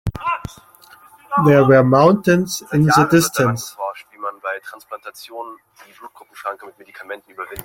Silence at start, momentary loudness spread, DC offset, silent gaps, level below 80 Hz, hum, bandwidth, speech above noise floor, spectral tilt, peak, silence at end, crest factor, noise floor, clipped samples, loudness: 0.05 s; 22 LU; under 0.1%; none; -46 dBFS; none; 17 kHz; 30 dB; -6 dB/octave; -2 dBFS; 0 s; 18 dB; -47 dBFS; under 0.1%; -16 LUFS